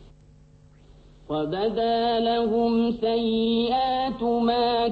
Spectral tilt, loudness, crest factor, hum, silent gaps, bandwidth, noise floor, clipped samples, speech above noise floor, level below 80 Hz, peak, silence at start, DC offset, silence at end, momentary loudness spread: -7.5 dB/octave; -24 LUFS; 12 dB; none; none; 5.2 kHz; -53 dBFS; under 0.1%; 30 dB; -50 dBFS; -12 dBFS; 0 s; under 0.1%; 0 s; 4 LU